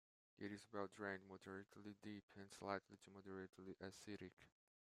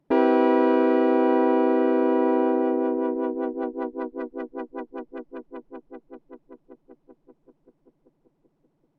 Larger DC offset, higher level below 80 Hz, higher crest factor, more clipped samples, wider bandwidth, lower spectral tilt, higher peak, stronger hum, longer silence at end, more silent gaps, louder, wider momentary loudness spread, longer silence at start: neither; second, -90 dBFS vs -70 dBFS; first, 26 dB vs 18 dB; neither; first, 15 kHz vs 5.2 kHz; second, -5 dB/octave vs -7 dB/octave; second, -30 dBFS vs -8 dBFS; neither; second, 0.45 s vs 2.25 s; first, 2.23-2.28 s, 4.33-4.37 s vs none; second, -55 LUFS vs -22 LUFS; second, 10 LU vs 21 LU; first, 0.4 s vs 0.1 s